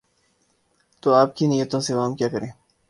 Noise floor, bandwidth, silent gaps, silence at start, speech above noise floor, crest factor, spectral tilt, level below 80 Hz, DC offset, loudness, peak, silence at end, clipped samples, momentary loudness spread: -66 dBFS; 11.5 kHz; none; 1.05 s; 45 dB; 20 dB; -6 dB/octave; -62 dBFS; under 0.1%; -22 LUFS; -2 dBFS; 0.4 s; under 0.1%; 10 LU